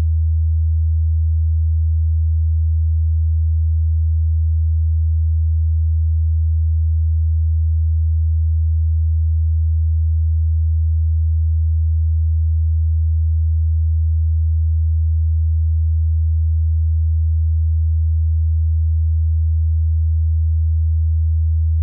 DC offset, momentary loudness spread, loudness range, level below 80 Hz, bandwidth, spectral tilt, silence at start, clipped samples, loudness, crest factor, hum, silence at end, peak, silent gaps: under 0.1%; 0 LU; 0 LU; -18 dBFS; 0.2 kHz; -28.5 dB/octave; 0 s; under 0.1%; -18 LUFS; 4 dB; none; 0 s; -12 dBFS; none